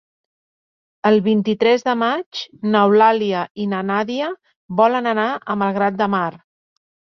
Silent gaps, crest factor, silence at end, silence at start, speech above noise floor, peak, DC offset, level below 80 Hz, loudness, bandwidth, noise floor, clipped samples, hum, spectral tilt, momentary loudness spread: 2.26-2.31 s, 3.51-3.55 s, 4.56-4.69 s; 18 dB; 0.8 s; 1.05 s; over 72 dB; -2 dBFS; under 0.1%; -64 dBFS; -18 LUFS; 6.4 kHz; under -90 dBFS; under 0.1%; none; -6.5 dB/octave; 11 LU